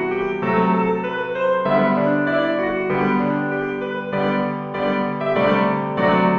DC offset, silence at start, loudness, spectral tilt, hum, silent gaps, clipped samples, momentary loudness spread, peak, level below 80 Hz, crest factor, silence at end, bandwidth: under 0.1%; 0 s; -20 LUFS; -8.5 dB/octave; none; none; under 0.1%; 6 LU; -6 dBFS; -52 dBFS; 14 dB; 0 s; 6.4 kHz